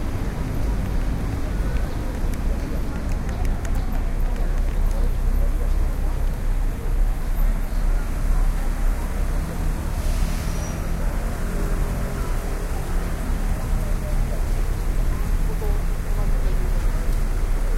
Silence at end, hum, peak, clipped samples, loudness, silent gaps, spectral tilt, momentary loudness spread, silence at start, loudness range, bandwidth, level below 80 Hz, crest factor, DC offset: 0 s; none; -10 dBFS; under 0.1%; -27 LUFS; none; -6 dB/octave; 2 LU; 0 s; 1 LU; 14.5 kHz; -22 dBFS; 12 dB; under 0.1%